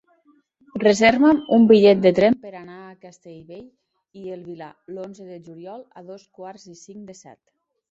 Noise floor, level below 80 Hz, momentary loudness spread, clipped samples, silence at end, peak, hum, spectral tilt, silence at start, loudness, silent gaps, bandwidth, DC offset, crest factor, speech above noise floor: -60 dBFS; -60 dBFS; 27 LU; under 0.1%; 0.8 s; -2 dBFS; none; -5.5 dB/octave; 0.75 s; -16 LUFS; none; 7.8 kHz; under 0.1%; 20 dB; 40 dB